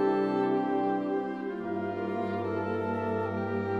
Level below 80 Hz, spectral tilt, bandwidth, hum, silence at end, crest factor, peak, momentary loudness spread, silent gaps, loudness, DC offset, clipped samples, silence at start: -68 dBFS; -9 dB/octave; 6.6 kHz; none; 0 s; 14 dB; -16 dBFS; 6 LU; none; -31 LUFS; under 0.1%; under 0.1%; 0 s